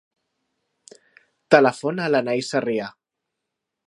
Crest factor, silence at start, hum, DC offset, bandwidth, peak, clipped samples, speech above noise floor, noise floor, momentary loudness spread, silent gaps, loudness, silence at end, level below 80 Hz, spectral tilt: 24 dB; 1.5 s; none; under 0.1%; 11.5 kHz; 0 dBFS; under 0.1%; 62 dB; -82 dBFS; 11 LU; none; -20 LUFS; 0.95 s; -74 dBFS; -5 dB/octave